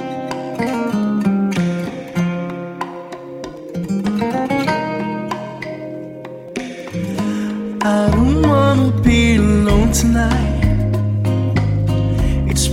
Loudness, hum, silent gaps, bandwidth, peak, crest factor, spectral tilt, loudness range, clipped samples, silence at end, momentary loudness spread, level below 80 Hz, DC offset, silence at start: -17 LUFS; none; none; 16 kHz; 0 dBFS; 16 dB; -6 dB/octave; 8 LU; under 0.1%; 0 s; 15 LU; -26 dBFS; under 0.1%; 0 s